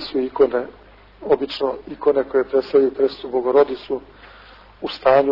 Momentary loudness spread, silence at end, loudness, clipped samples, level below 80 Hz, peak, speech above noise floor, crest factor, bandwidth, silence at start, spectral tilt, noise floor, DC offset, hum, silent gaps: 12 LU; 0 s; -20 LUFS; under 0.1%; -52 dBFS; -4 dBFS; 26 dB; 14 dB; 5.8 kHz; 0 s; -7 dB/octave; -45 dBFS; under 0.1%; none; none